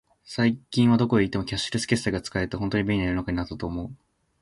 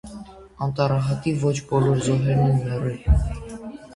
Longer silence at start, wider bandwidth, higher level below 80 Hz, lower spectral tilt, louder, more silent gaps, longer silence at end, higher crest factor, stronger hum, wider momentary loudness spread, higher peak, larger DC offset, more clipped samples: first, 0.25 s vs 0.05 s; about the same, 11.5 kHz vs 11 kHz; second, -44 dBFS vs -30 dBFS; about the same, -6 dB/octave vs -7 dB/octave; second, -25 LUFS vs -22 LUFS; neither; first, 0.45 s vs 0 s; about the same, 18 dB vs 16 dB; neither; second, 11 LU vs 15 LU; about the same, -6 dBFS vs -6 dBFS; neither; neither